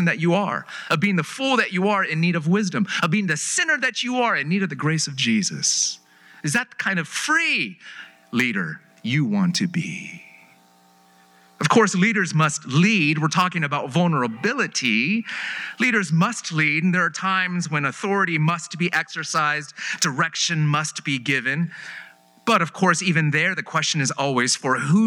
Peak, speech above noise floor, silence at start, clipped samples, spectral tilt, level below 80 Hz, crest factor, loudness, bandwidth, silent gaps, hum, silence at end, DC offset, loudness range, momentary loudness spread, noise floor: -4 dBFS; 34 dB; 0 s; under 0.1%; -4 dB/octave; -80 dBFS; 18 dB; -21 LUFS; 14.5 kHz; none; none; 0 s; under 0.1%; 3 LU; 9 LU; -55 dBFS